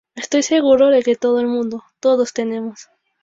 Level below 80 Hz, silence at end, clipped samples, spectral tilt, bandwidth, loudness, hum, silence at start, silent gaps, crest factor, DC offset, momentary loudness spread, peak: -62 dBFS; 0.4 s; under 0.1%; -3.5 dB/octave; 7.8 kHz; -17 LUFS; none; 0.15 s; none; 14 dB; under 0.1%; 12 LU; -2 dBFS